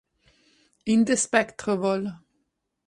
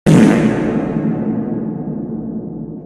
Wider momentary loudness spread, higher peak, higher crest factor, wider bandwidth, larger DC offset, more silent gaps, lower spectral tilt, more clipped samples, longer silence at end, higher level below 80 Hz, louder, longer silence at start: second, 12 LU vs 15 LU; second, -6 dBFS vs 0 dBFS; about the same, 20 dB vs 16 dB; about the same, 11.5 kHz vs 12.5 kHz; neither; neither; second, -4 dB/octave vs -7.5 dB/octave; neither; first, 0.7 s vs 0 s; second, -64 dBFS vs -42 dBFS; second, -24 LUFS vs -17 LUFS; first, 0.85 s vs 0.05 s